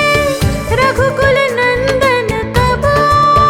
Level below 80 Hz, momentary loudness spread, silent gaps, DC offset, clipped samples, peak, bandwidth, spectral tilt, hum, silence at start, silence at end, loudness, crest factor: -26 dBFS; 5 LU; none; under 0.1%; under 0.1%; 0 dBFS; 19.5 kHz; -5 dB/octave; none; 0 s; 0 s; -12 LUFS; 12 dB